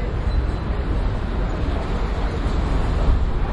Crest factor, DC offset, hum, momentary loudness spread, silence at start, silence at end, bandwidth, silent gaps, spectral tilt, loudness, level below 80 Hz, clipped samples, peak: 14 dB; under 0.1%; none; 3 LU; 0 s; 0 s; 8.2 kHz; none; -7.5 dB/octave; -24 LUFS; -22 dBFS; under 0.1%; -6 dBFS